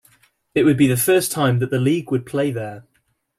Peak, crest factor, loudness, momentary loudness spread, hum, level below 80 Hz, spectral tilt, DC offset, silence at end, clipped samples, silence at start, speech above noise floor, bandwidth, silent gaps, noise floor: -4 dBFS; 16 dB; -19 LUFS; 9 LU; none; -56 dBFS; -5.5 dB/octave; under 0.1%; 0.6 s; under 0.1%; 0.55 s; 49 dB; 16 kHz; none; -67 dBFS